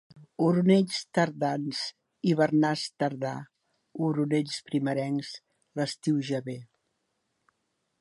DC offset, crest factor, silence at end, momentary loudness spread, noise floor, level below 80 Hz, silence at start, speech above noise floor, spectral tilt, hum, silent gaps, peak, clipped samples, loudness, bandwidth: under 0.1%; 20 dB; 1.35 s; 17 LU; -78 dBFS; -76 dBFS; 0.15 s; 51 dB; -6 dB/octave; none; none; -10 dBFS; under 0.1%; -28 LUFS; 11.5 kHz